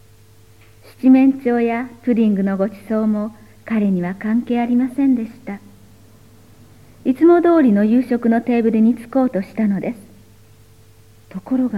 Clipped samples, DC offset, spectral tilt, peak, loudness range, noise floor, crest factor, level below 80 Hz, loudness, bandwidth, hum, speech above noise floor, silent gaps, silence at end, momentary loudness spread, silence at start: under 0.1%; 0.2%; -9 dB/octave; -2 dBFS; 5 LU; -48 dBFS; 16 dB; -56 dBFS; -17 LUFS; 12 kHz; none; 32 dB; none; 0 s; 14 LU; 1.05 s